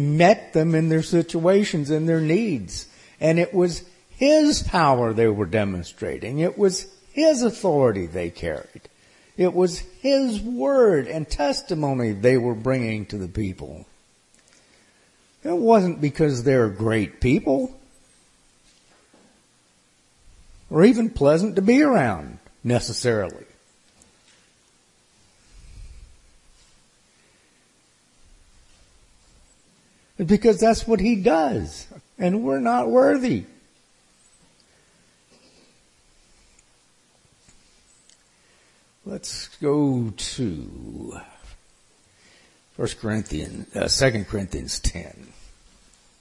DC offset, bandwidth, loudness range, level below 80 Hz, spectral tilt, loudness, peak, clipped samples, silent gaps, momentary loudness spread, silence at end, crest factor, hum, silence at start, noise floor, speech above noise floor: under 0.1%; 11.5 kHz; 9 LU; -44 dBFS; -6 dB/octave; -21 LUFS; -2 dBFS; under 0.1%; none; 15 LU; 0.95 s; 22 dB; none; 0 s; -60 dBFS; 40 dB